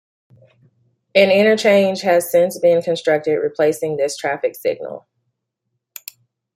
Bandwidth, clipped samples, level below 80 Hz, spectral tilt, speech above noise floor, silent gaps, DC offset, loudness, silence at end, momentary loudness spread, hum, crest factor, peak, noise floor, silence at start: 16.5 kHz; under 0.1%; -68 dBFS; -4.5 dB/octave; 60 dB; none; under 0.1%; -16 LUFS; 1.55 s; 21 LU; none; 16 dB; -2 dBFS; -76 dBFS; 1.15 s